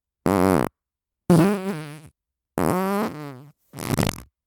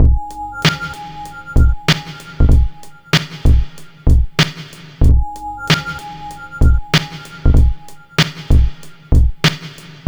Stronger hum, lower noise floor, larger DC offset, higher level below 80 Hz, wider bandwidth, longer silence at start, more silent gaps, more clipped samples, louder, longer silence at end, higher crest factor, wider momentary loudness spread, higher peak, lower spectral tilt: neither; first, -86 dBFS vs -34 dBFS; neither; second, -48 dBFS vs -16 dBFS; about the same, 19.5 kHz vs over 20 kHz; first, 0.25 s vs 0 s; neither; neither; second, -23 LUFS vs -16 LUFS; about the same, 0.25 s vs 0.15 s; first, 20 dB vs 14 dB; about the same, 18 LU vs 16 LU; about the same, -2 dBFS vs 0 dBFS; first, -6.5 dB/octave vs -5 dB/octave